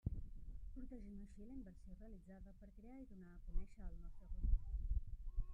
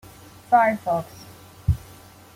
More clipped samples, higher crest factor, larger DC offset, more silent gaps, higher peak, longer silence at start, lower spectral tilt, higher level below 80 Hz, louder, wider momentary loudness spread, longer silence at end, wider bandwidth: neither; about the same, 20 dB vs 20 dB; neither; neither; second, -24 dBFS vs -4 dBFS; second, 0.05 s vs 0.5 s; first, -9.5 dB/octave vs -7 dB/octave; second, -46 dBFS vs -40 dBFS; second, -53 LUFS vs -23 LUFS; second, 14 LU vs 18 LU; second, 0 s vs 0.6 s; second, 2.5 kHz vs 16.5 kHz